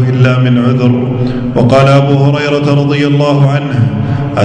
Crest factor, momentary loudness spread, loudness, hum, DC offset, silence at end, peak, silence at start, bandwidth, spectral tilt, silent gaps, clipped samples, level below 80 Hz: 8 dB; 6 LU; -10 LUFS; none; under 0.1%; 0 s; 0 dBFS; 0 s; 8.6 kHz; -8 dB/octave; none; 1%; -36 dBFS